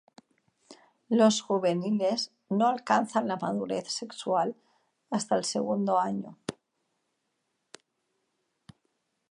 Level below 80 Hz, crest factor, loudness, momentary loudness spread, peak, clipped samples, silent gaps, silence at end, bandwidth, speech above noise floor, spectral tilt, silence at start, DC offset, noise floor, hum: -78 dBFS; 22 dB; -28 LUFS; 11 LU; -8 dBFS; under 0.1%; none; 2.8 s; 11 kHz; 52 dB; -4.5 dB/octave; 0.7 s; under 0.1%; -79 dBFS; none